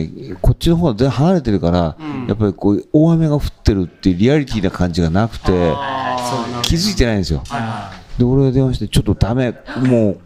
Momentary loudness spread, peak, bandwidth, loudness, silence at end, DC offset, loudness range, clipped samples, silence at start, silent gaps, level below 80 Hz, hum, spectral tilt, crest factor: 8 LU; 0 dBFS; 15.5 kHz; -16 LUFS; 0.05 s; under 0.1%; 2 LU; under 0.1%; 0 s; none; -28 dBFS; none; -6.5 dB/octave; 14 dB